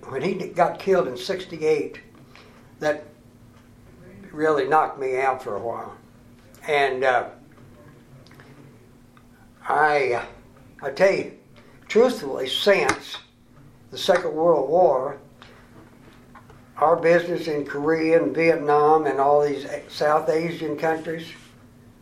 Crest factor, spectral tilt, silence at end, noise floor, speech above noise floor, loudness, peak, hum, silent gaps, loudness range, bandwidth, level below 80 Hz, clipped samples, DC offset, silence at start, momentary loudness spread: 22 dB; -5 dB/octave; 0.65 s; -51 dBFS; 30 dB; -22 LUFS; -2 dBFS; none; none; 7 LU; 14.5 kHz; -60 dBFS; under 0.1%; under 0.1%; 0 s; 16 LU